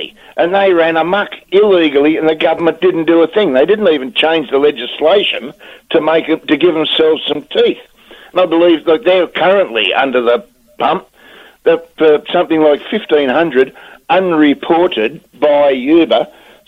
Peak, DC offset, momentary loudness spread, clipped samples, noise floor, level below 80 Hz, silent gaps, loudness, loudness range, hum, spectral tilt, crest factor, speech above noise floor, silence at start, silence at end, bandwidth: 0 dBFS; under 0.1%; 6 LU; under 0.1%; -40 dBFS; -54 dBFS; none; -12 LUFS; 2 LU; none; -6.5 dB/octave; 12 dB; 29 dB; 0 s; 0.4 s; 5.6 kHz